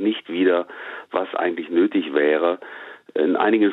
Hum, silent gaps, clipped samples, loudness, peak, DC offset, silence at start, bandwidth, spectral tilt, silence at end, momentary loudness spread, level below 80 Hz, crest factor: none; none; under 0.1%; -21 LUFS; -6 dBFS; under 0.1%; 0 s; 4.1 kHz; -7.5 dB/octave; 0 s; 14 LU; -74 dBFS; 14 dB